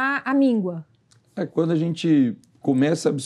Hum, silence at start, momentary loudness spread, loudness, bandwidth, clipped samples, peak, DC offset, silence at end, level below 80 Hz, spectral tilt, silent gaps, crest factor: none; 0 s; 11 LU; -22 LUFS; 11 kHz; under 0.1%; -8 dBFS; under 0.1%; 0 s; -78 dBFS; -6.5 dB/octave; none; 14 dB